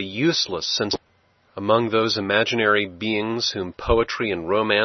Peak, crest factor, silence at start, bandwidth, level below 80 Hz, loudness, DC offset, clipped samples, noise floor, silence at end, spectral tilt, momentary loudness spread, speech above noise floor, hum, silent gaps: -2 dBFS; 20 dB; 0 s; 6.4 kHz; -42 dBFS; -22 LUFS; under 0.1%; under 0.1%; -61 dBFS; 0 s; -4 dB/octave; 7 LU; 40 dB; none; none